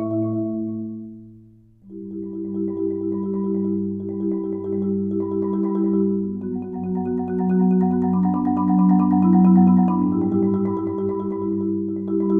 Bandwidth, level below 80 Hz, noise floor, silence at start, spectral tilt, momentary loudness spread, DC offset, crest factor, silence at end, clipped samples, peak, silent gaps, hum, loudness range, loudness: 2.6 kHz; -58 dBFS; -49 dBFS; 0 s; -13.5 dB/octave; 12 LU; under 0.1%; 16 dB; 0 s; under 0.1%; -4 dBFS; none; none; 9 LU; -21 LUFS